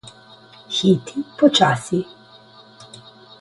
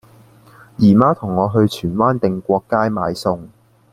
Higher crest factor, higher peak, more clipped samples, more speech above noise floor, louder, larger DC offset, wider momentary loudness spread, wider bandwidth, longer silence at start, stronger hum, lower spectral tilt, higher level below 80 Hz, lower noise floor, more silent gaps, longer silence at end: about the same, 20 dB vs 16 dB; about the same, -2 dBFS vs 0 dBFS; neither; about the same, 29 dB vs 31 dB; about the same, -18 LUFS vs -17 LUFS; neither; first, 22 LU vs 9 LU; second, 11.5 kHz vs 13.5 kHz; about the same, 0.7 s vs 0.8 s; neither; second, -5 dB/octave vs -8 dB/octave; second, -60 dBFS vs -50 dBFS; about the same, -47 dBFS vs -47 dBFS; neither; about the same, 0.55 s vs 0.45 s